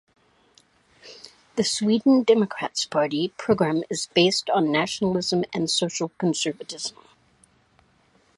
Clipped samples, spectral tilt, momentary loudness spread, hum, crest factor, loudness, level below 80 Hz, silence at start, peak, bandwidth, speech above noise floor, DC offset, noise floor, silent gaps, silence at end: under 0.1%; -4 dB/octave; 13 LU; none; 20 dB; -23 LUFS; -64 dBFS; 1.05 s; -6 dBFS; 11.5 kHz; 39 dB; under 0.1%; -61 dBFS; none; 1.45 s